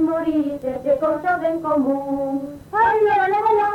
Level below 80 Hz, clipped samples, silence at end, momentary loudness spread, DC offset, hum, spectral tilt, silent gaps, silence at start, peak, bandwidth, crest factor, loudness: -54 dBFS; under 0.1%; 0 s; 8 LU; under 0.1%; none; -7 dB/octave; none; 0 s; -8 dBFS; 16 kHz; 12 dB; -20 LUFS